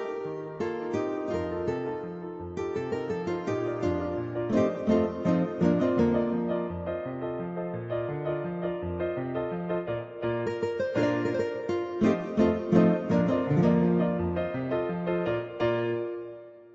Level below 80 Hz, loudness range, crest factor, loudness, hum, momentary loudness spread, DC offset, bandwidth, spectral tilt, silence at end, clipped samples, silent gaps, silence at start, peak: -56 dBFS; 7 LU; 20 dB; -29 LUFS; none; 10 LU; under 0.1%; 7.6 kHz; -8.5 dB/octave; 0 s; under 0.1%; none; 0 s; -8 dBFS